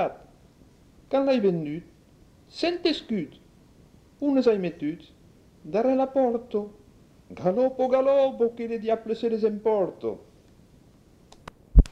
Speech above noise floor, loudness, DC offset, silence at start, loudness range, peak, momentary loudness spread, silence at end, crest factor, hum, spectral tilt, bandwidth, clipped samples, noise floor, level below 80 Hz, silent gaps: 31 dB; -26 LUFS; under 0.1%; 0 s; 4 LU; -2 dBFS; 13 LU; 0 s; 24 dB; none; -7.5 dB/octave; 8.2 kHz; under 0.1%; -55 dBFS; -32 dBFS; none